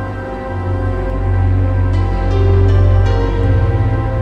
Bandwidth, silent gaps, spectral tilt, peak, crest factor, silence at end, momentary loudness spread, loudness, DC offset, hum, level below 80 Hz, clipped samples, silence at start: 5.8 kHz; none; -9 dB/octave; -2 dBFS; 12 dB; 0 s; 9 LU; -15 LUFS; under 0.1%; none; -18 dBFS; under 0.1%; 0 s